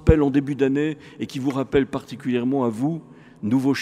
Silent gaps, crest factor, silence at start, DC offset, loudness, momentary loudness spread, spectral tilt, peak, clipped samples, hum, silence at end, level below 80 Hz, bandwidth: none; 22 dB; 0 s; under 0.1%; -23 LUFS; 11 LU; -7.5 dB/octave; 0 dBFS; under 0.1%; none; 0 s; -36 dBFS; 12.5 kHz